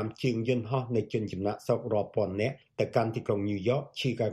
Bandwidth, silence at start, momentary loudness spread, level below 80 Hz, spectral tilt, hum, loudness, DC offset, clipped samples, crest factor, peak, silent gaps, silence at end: 14 kHz; 0 s; 4 LU; -64 dBFS; -7 dB/octave; none; -31 LUFS; under 0.1%; under 0.1%; 18 dB; -12 dBFS; none; 0 s